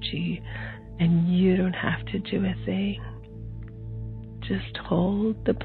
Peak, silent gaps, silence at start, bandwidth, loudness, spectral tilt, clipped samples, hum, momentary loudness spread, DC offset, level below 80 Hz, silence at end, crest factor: -10 dBFS; none; 0 s; 4.5 kHz; -26 LUFS; -10.5 dB/octave; under 0.1%; none; 17 LU; under 0.1%; -42 dBFS; 0 s; 16 dB